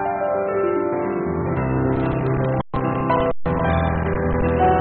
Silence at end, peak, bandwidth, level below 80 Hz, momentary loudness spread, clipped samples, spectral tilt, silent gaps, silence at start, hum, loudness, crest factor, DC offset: 0 s; -6 dBFS; 4.3 kHz; -32 dBFS; 3 LU; under 0.1%; -7.5 dB/octave; none; 0 s; none; -21 LUFS; 14 dB; under 0.1%